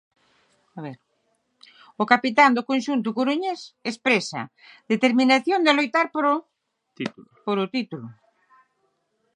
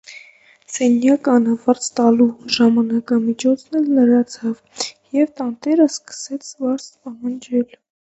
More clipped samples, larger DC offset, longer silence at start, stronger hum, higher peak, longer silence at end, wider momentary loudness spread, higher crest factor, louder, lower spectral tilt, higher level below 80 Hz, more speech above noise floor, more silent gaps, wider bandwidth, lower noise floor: neither; neither; first, 0.75 s vs 0.1 s; neither; about the same, 0 dBFS vs 0 dBFS; first, 1.25 s vs 0.5 s; first, 19 LU vs 14 LU; first, 24 dB vs 18 dB; second, -22 LUFS vs -18 LUFS; about the same, -4.5 dB/octave vs -4.5 dB/octave; second, -78 dBFS vs -66 dBFS; first, 49 dB vs 31 dB; neither; first, 10.5 kHz vs 8.2 kHz; first, -71 dBFS vs -48 dBFS